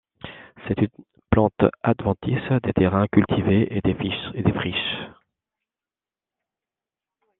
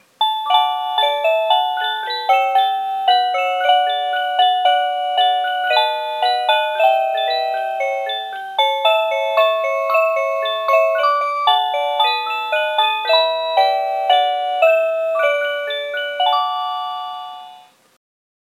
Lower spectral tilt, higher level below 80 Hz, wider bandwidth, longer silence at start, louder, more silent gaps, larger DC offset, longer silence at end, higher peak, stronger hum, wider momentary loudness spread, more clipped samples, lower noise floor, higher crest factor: first, -10.5 dB/octave vs 1 dB/octave; first, -46 dBFS vs -90 dBFS; second, 4.1 kHz vs 13.5 kHz; about the same, 0.25 s vs 0.2 s; second, -22 LUFS vs -17 LUFS; neither; neither; first, 2.3 s vs 0.95 s; about the same, -2 dBFS vs 0 dBFS; neither; first, 13 LU vs 6 LU; neither; first, under -90 dBFS vs -44 dBFS; first, 22 dB vs 16 dB